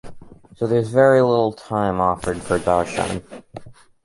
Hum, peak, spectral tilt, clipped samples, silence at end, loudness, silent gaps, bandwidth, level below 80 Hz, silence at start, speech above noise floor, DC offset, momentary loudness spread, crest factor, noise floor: none; -4 dBFS; -6.5 dB/octave; under 0.1%; 0.3 s; -19 LUFS; none; 11.5 kHz; -44 dBFS; 0.05 s; 19 dB; under 0.1%; 13 LU; 18 dB; -38 dBFS